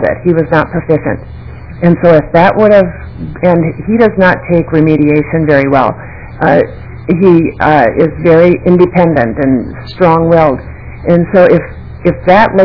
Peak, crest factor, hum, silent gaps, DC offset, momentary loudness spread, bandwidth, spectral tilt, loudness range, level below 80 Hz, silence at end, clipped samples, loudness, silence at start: 0 dBFS; 8 dB; none; none; 0.9%; 14 LU; 5.4 kHz; -10 dB/octave; 1 LU; -32 dBFS; 0 s; 4%; -9 LUFS; 0 s